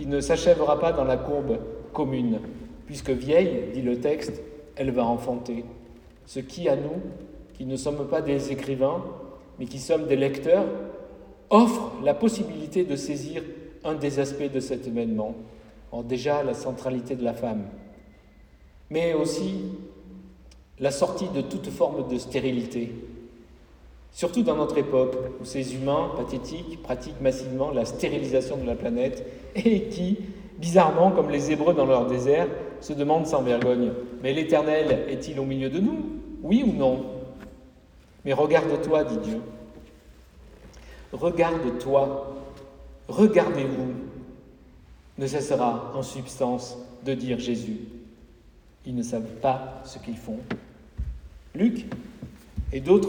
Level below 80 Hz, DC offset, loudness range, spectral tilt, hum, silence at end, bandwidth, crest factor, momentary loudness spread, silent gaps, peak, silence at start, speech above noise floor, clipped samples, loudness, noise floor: -48 dBFS; under 0.1%; 7 LU; -6.5 dB/octave; none; 0 s; 17.5 kHz; 22 dB; 18 LU; none; -4 dBFS; 0 s; 28 dB; under 0.1%; -26 LUFS; -53 dBFS